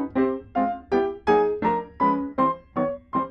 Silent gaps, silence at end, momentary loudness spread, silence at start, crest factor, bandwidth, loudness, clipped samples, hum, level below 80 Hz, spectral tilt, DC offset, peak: none; 0 s; 6 LU; 0 s; 16 dB; 6.4 kHz; -24 LUFS; under 0.1%; none; -52 dBFS; -8 dB/octave; under 0.1%; -8 dBFS